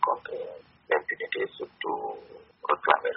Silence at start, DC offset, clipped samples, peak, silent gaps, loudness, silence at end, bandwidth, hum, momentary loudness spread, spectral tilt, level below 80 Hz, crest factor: 0 s; under 0.1%; under 0.1%; -2 dBFS; none; -30 LUFS; 0 s; 5.8 kHz; none; 14 LU; 0 dB/octave; -74 dBFS; 26 dB